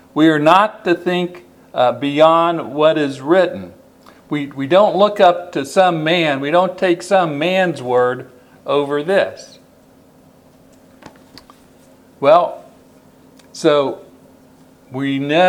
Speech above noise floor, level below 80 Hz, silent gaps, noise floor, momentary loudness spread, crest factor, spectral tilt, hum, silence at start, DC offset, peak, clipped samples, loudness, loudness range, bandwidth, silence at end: 33 dB; -62 dBFS; none; -48 dBFS; 14 LU; 16 dB; -5.5 dB/octave; none; 0.15 s; under 0.1%; 0 dBFS; under 0.1%; -15 LUFS; 8 LU; 14.5 kHz; 0 s